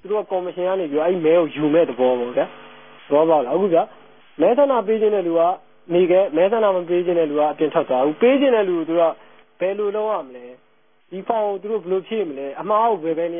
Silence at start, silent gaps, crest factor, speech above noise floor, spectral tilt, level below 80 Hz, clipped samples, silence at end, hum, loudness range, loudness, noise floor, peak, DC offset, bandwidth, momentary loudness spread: 0.05 s; none; 16 dB; 42 dB; -11 dB/octave; -74 dBFS; under 0.1%; 0 s; none; 6 LU; -19 LUFS; -61 dBFS; -4 dBFS; 0.2%; 3.7 kHz; 9 LU